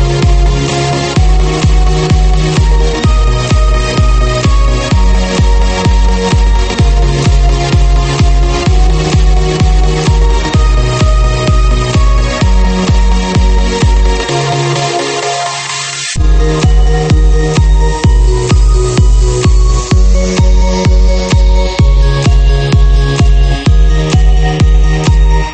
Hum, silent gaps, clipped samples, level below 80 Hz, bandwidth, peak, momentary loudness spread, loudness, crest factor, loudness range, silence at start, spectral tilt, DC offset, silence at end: none; none; under 0.1%; -8 dBFS; 8.8 kHz; 0 dBFS; 2 LU; -10 LUFS; 8 dB; 2 LU; 0 s; -5.5 dB/octave; under 0.1%; 0 s